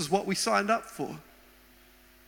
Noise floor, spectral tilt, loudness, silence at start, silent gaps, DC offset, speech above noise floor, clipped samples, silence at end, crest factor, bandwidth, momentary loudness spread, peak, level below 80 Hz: -57 dBFS; -3.5 dB/octave; -29 LUFS; 0 s; none; under 0.1%; 29 dB; under 0.1%; 1.05 s; 20 dB; 17.5 kHz; 13 LU; -12 dBFS; -64 dBFS